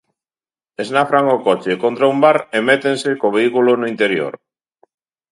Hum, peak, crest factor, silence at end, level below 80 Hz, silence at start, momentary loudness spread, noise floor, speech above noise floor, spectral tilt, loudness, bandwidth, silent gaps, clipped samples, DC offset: none; 0 dBFS; 16 dB; 0.95 s; -68 dBFS; 0.8 s; 6 LU; under -90 dBFS; over 75 dB; -5 dB/octave; -15 LUFS; 11.5 kHz; none; under 0.1%; under 0.1%